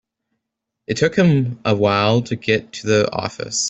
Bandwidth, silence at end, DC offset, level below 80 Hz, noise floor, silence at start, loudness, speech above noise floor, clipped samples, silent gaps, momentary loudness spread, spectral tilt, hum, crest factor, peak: 8.4 kHz; 0 s; under 0.1%; -54 dBFS; -80 dBFS; 0.9 s; -18 LUFS; 62 dB; under 0.1%; none; 7 LU; -5 dB/octave; none; 16 dB; -2 dBFS